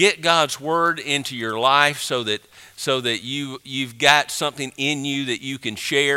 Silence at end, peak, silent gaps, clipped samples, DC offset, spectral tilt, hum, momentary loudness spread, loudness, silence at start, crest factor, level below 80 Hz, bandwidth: 0 s; 0 dBFS; none; under 0.1%; under 0.1%; -2.5 dB/octave; none; 12 LU; -20 LUFS; 0 s; 22 dB; -66 dBFS; 16.5 kHz